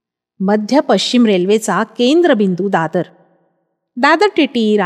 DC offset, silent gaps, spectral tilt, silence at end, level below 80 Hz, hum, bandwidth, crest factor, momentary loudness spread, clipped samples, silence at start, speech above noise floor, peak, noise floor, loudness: under 0.1%; none; -5 dB/octave; 0 s; -72 dBFS; none; 14 kHz; 14 dB; 8 LU; under 0.1%; 0.4 s; 53 dB; 0 dBFS; -65 dBFS; -14 LUFS